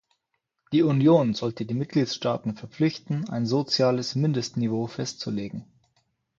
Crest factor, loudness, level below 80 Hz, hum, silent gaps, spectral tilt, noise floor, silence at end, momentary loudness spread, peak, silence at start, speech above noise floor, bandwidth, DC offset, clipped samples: 18 dB; -25 LUFS; -64 dBFS; none; none; -6.5 dB/octave; -79 dBFS; 0.75 s; 11 LU; -8 dBFS; 0.7 s; 54 dB; 7.8 kHz; under 0.1%; under 0.1%